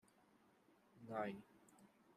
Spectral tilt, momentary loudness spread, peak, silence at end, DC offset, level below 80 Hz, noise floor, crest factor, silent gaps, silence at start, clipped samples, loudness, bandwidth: -6.5 dB/octave; 22 LU; -32 dBFS; 0.05 s; under 0.1%; under -90 dBFS; -74 dBFS; 24 dB; none; 0.95 s; under 0.1%; -49 LUFS; 14.5 kHz